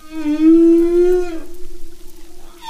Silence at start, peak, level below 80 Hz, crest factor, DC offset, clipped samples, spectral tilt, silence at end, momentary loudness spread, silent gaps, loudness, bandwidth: 0.05 s; -4 dBFS; -32 dBFS; 12 dB; under 0.1%; under 0.1%; -6.5 dB/octave; 0 s; 15 LU; none; -13 LUFS; 11 kHz